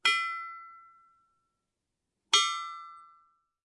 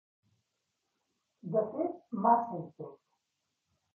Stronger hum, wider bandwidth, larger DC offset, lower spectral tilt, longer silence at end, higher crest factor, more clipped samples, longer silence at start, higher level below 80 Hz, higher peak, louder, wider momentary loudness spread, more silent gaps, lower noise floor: neither; first, 11.5 kHz vs 2.5 kHz; neither; second, 3.5 dB/octave vs -10 dB/octave; second, 0.65 s vs 1 s; about the same, 24 dB vs 24 dB; neither; second, 0.05 s vs 1.45 s; second, -88 dBFS vs -82 dBFS; about the same, -10 dBFS vs -12 dBFS; first, -28 LUFS vs -32 LUFS; first, 24 LU vs 21 LU; neither; about the same, -85 dBFS vs -84 dBFS